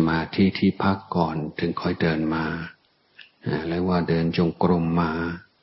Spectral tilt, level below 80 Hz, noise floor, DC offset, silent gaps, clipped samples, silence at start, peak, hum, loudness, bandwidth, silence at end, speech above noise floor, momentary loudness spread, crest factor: -11 dB/octave; -48 dBFS; -53 dBFS; under 0.1%; none; under 0.1%; 0 s; -6 dBFS; none; -24 LUFS; 5.8 kHz; 0.2 s; 30 dB; 8 LU; 18 dB